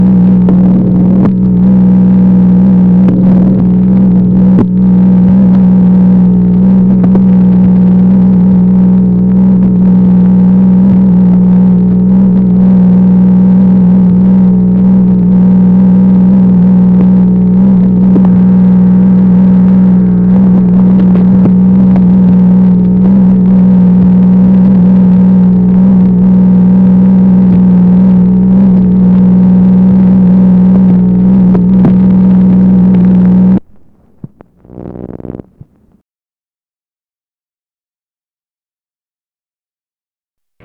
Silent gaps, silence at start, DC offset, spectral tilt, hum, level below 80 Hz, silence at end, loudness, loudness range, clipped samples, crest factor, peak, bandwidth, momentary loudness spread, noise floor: none; 0 s; under 0.1%; -13 dB/octave; none; -28 dBFS; 5.3 s; -6 LUFS; 1 LU; under 0.1%; 6 dB; 0 dBFS; 2.3 kHz; 1 LU; under -90 dBFS